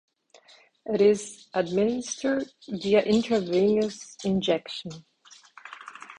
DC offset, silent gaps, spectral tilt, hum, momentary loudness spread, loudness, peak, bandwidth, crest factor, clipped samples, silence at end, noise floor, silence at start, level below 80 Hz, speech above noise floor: under 0.1%; none; -5 dB/octave; none; 20 LU; -26 LUFS; -8 dBFS; 10.5 kHz; 18 dB; under 0.1%; 0.05 s; -57 dBFS; 0.85 s; -62 dBFS; 32 dB